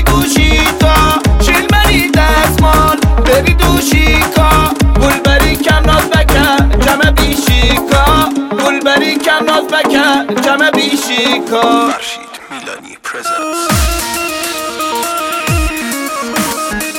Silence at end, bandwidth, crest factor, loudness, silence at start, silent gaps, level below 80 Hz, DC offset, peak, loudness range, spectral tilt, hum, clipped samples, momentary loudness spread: 0 s; 17 kHz; 10 dB; -10 LUFS; 0 s; none; -16 dBFS; under 0.1%; 0 dBFS; 6 LU; -4 dB/octave; none; under 0.1%; 8 LU